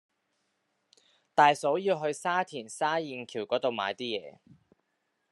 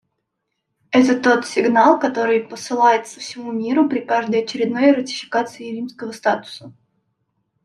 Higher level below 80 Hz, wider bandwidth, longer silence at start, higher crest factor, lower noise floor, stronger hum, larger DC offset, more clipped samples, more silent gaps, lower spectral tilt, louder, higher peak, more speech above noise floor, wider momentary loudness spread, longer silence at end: second, -84 dBFS vs -68 dBFS; about the same, 11.5 kHz vs 12 kHz; first, 1.35 s vs 0.9 s; first, 24 dB vs 18 dB; about the same, -79 dBFS vs -76 dBFS; neither; neither; neither; neither; about the same, -4 dB/octave vs -4.5 dB/octave; second, -29 LUFS vs -18 LUFS; second, -8 dBFS vs -2 dBFS; second, 50 dB vs 58 dB; about the same, 13 LU vs 14 LU; about the same, 1 s vs 0.95 s